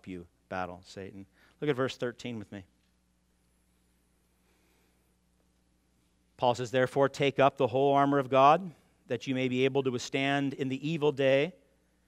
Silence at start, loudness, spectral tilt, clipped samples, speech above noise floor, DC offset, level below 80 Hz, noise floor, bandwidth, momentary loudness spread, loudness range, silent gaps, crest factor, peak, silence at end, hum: 0.05 s; -28 LUFS; -6 dB/octave; under 0.1%; 42 dB; under 0.1%; -72 dBFS; -71 dBFS; 13 kHz; 20 LU; 12 LU; none; 22 dB; -10 dBFS; 0.55 s; none